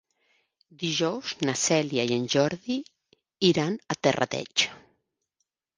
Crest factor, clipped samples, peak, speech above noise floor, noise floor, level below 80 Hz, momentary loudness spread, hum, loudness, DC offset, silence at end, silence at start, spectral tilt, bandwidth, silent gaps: 22 dB; under 0.1%; -6 dBFS; 54 dB; -80 dBFS; -68 dBFS; 7 LU; none; -26 LUFS; under 0.1%; 1 s; 0.8 s; -3.5 dB/octave; 10.5 kHz; none